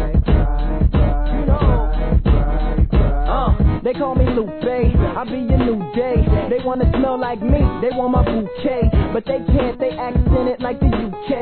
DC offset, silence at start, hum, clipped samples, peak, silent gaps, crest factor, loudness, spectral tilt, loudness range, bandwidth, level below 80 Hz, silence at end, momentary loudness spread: 0.3%; 0 s; none; under 0.1%; -2 dBFS; none; 14 dB; -18 LUFS; -12 dB/octave; 1 LU; 4.5 kHz; -18 dBFS; 0 s; 4 LU